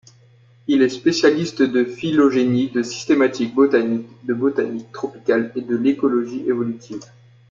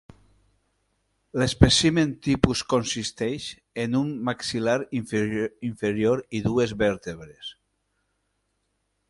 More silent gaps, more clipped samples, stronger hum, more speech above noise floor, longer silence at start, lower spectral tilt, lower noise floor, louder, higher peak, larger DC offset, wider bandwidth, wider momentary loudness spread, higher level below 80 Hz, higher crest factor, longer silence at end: neither; neither; second, none vs 50 Hz at -55 dBFS; second, 32 dB vs 50 dB; second, 0.7 s vs 1.35 s; about the same, -5.5 dB/octave vs -5 dB/octave; second, -51 dBFS vs -75 dBFS; first, -19 LUFS vs -24 LUFS; about the same, -2 dBFS vs 0 dBFS; neither; second, 7.6 kHz vs 11.5 kHz; second, 10 LU vs 15 LU; second, -62 dBFS vs -42 dBFS; second, 16 dB vs 26 dB; second, 0.45 s vs 1.55 s